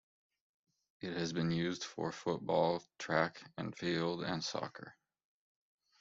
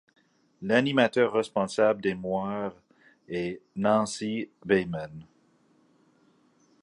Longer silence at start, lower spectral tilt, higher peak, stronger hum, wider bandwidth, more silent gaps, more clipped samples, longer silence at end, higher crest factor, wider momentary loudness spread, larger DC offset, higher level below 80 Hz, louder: first, 1 s vs 0.6 s; about the same, -4.5 dB/octave vs -5.5 dB/octave; second, -16 dBFS vs -6 dBFS; neither; second, 7.8 kHz vs 11.5 kHz; neither; neither; second, 1.1 s vs 1.6 s; about the same, 22 dB vs 22 dB; about the same, 12 LU vs 13 LU; neither; second, -74 dBFS vs -64 dBFS; second, -37 LUFS vs -27 LUFS